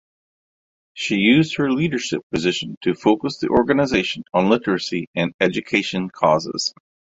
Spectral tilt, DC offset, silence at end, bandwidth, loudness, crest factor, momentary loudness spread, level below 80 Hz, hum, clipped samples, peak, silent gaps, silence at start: -5 dB/octave; under 0.1%; 0.5 s; 8 kHz; -20 LUFS; 20 dB; 8 LU; -52 dBFS; none; under 0.1%; -2 dBFS; 2.23-2.30 s, 2.77-2.81 s, 5.07-5.14 s, 5.34-5.39 s; 0.95 s